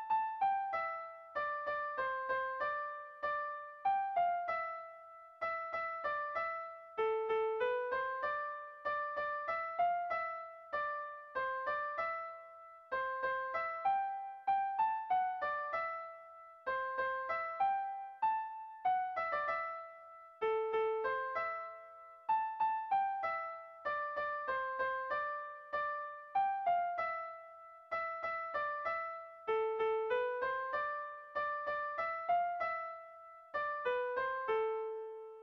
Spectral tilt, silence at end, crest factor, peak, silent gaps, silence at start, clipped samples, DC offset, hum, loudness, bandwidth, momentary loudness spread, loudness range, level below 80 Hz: 0.5 dB/octave; 0 s; 14 dB; -24 dBFS; none; 0 s; under 0.1%; under 0.1%; none; -38 LUFS; 6.4 kHz; 10 LU; 2 LU; -76 dBFS